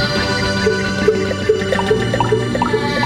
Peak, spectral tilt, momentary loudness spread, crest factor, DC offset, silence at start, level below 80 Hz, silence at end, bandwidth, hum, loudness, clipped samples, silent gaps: 0 dBFS; -5 dB/octave; 1 LU; 16 dB; under 0.1%; 0 s; -36 dBFS; 0 s; 15.5 kHz; none; -16 LUFS; under 0.1%; none